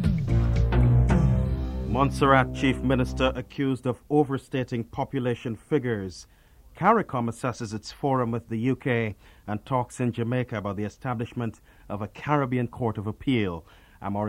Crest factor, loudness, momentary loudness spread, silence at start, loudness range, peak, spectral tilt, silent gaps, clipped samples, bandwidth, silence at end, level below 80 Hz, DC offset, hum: 22 dB; -26 LUFS; 12 LU; 0 s; 6 LU; -4 dBFS; -7.5 dB/octave; none; under 0.1%; 11.5 kHz; 0 s; -34 dBFS; under 0.1%; none